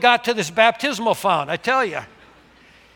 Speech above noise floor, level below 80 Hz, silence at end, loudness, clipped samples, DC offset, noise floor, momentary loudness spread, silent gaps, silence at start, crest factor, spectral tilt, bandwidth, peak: 31 dB; -62 dBFS; 0.9 s; -19 LUFS; under 0.1%; under 0.1%; -50 dBFS; 6 LU; none; 0 s; 20 dB; -3 dB/octave; 18 kHz; 0 dBFS